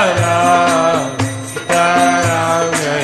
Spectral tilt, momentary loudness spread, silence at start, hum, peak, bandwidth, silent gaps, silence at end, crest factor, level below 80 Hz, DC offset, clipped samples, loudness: -4 dB/octave; 8 LU; 0 s; none; 0 dBFS; 13 kHz; none; 0 s; 14 dB; -50 dBFS; 0.1%; under 0.1%; -13 LUFS